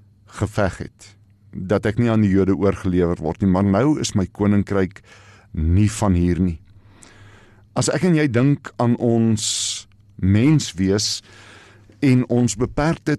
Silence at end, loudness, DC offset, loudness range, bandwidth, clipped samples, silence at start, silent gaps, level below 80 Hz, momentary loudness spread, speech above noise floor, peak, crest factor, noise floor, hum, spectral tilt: 0 s; -19 LUFS; under 0.1%; 3 LU; 13 kHz; under 0.1%; 0.35 s; none; -40 dBFS; 10 LU; 29 dB; -8 dBFS; 12 dB; -48 dBFS; none; -6 dB/octave